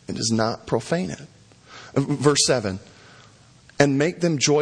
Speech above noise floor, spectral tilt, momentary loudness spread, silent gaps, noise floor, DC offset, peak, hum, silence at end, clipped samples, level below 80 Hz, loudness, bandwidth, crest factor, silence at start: 30 dB; -4 dB/octave; 13 LU; none; -51 dBFS; under 0.1%; 0 dBFS; none; 0 s; under 0.1%; -56 dBFS; -22 LUFS; 10.5 kHz; 22 dB; 0.1 s